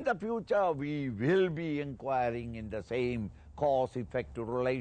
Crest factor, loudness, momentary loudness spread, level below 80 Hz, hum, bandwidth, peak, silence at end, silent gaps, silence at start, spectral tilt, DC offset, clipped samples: 14 dB; -33 LUFS; 9 LU; -56 dBFS; none; 9 kHz; -18 dBFS; 0 s; none; 0 s; -8 dB/octave; under 0.1%; under 0.1%